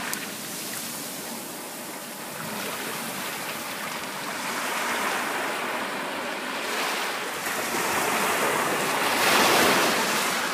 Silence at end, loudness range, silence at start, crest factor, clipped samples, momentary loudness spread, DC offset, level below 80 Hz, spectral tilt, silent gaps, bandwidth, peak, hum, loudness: 0 s; 9 LU; 0 s; 24 dB; under 0.1%; 13 LU; under 0.1%; -70 dBFS; -1.5 dB/octave; none; 15.5 kHz; -4 dBFS; none; -26 LUFS